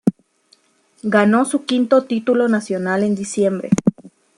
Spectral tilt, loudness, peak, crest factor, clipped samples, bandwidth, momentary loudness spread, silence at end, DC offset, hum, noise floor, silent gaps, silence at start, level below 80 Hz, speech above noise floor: -6 dB/octave; -18 LUFS; -2 dBFS; 16 dB; under 0.1%; 11 kHz; 6 LU; 0.35 s; under 0.1%; none; -58 dBFS; none; 0.05 s; -56 dBFS; 41 dB